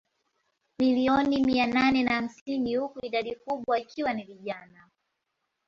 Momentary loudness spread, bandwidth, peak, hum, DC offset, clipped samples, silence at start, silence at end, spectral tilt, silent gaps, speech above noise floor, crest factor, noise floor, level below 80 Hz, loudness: 12 LU; 7.2 kHz; -10 dBFS; none; under 0.1%; under 0.1%; 0.8 s; 1.05 s; -5.5 dB/octave; 2.41-2.46 s; 54 dB; 18 dB; -81 dBFS; -60 dBFS; -27 LUFS